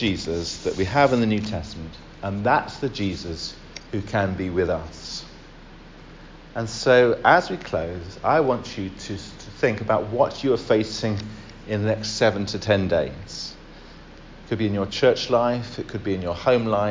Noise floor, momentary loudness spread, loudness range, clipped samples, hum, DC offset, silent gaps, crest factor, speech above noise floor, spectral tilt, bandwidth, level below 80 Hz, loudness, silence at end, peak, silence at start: -44 dBFS; 15 LU; 5 LU; under 0.1%; none; under 0.1%; none; 22 dB; 21 dB; -5.5 dB/octave; 7.6 kHz; -44 dBFS; -23 LUFS; 0 s; -2 dBFS; 0 s